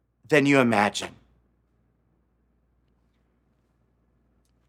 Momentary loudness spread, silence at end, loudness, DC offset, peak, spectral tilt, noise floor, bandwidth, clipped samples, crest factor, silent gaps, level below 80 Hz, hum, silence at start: 14 LU; 3.6 s; -22 LUFS; under 0.1%; -4 dBFS; -5 dB/octave; -68 dBFS; 14.5 kHz; under 0.1%; 24 dB; none; -68 dBFS; none; 0.3 s